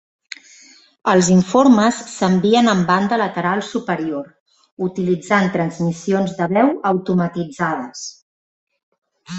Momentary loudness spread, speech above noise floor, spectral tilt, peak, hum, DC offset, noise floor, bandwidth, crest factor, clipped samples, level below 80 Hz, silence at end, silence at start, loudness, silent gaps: 16 LU; 31 dB; -5.5 dB/octave; -2 dBFS; none; under 0.1%; -47 dBFS; 8.2 kHz; 18 dB; under 0.1%; -58 dBFS; 0 s; 1.05 s; -17 LUFS; 4.40-4.46 s, 4.72-4.77 s, 8.22-8.67 s, 8.83-8.92 s, 8.98-9.02 s